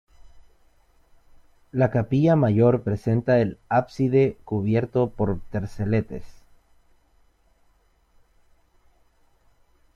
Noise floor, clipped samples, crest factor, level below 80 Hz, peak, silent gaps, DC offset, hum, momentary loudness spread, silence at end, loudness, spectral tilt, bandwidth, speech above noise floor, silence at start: -62 dBFS; under 0.1%; 20 dB; -50 dBFS; -4 dBFS; none; under 0.1%; none; 10 LU; 3.55 s; -23 LUFS; -9.5 dB/octave; 7 kHz; 40 dB; 0.25 s